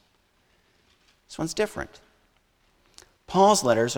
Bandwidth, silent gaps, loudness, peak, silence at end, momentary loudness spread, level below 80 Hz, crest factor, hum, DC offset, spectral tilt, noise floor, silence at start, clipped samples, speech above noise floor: 18.5 kHz; none; -23 LUFS; -8 dBFS; 0 s; 20 LU; -56 dBFS; 20 dB; none; under 0.1%; -4 dB/octave; -66 dBFS; 1.3 s; under 0.1%; 43 dB